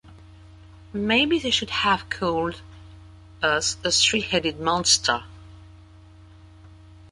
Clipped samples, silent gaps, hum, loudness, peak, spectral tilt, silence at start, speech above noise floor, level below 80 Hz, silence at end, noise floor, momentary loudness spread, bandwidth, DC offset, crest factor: under 0.1%; none; none; -22 LUFS; -4 dBFS; -2 dB/octave; 0.05 s; 25 dB; -48 dBFS; 0.15 s; -48 dBFS; 11 LU; 11.5 kHz; under 0.1%; 20 dB